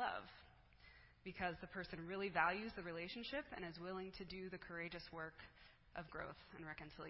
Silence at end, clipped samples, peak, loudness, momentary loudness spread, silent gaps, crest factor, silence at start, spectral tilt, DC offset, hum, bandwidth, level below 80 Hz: 0 s; under 0.1%; -22 dBFS; -48 LUFS; 22 LU; none; 26 dB; 0 s; -3 dB/octave; under 0.1%; none; 5.6 kHz; -68 dBFS